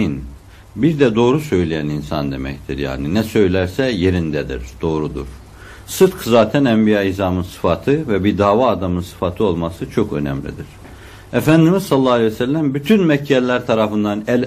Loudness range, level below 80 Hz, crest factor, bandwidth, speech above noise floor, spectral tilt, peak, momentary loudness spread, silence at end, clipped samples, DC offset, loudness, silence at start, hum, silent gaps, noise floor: 4 LU; -40 dBFS; 16 dB; 15.5 kHz; 21 dB; -6.5 dB/octave; -2 dBFS; 12 LU; 0 s; under 0.1%; under 0.1%; -17 LUFS; 0 s; none; none; -37 dBFS